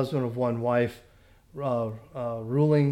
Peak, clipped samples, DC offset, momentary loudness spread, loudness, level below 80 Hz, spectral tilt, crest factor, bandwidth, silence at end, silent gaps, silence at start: -12 dBFS; under 0.1%; under 0.1%; 11 LU; -28 LUFS; -60 dBFS; -9 dB/octave; 14 dB; 12.5 kHz; 0 s; none; 0 s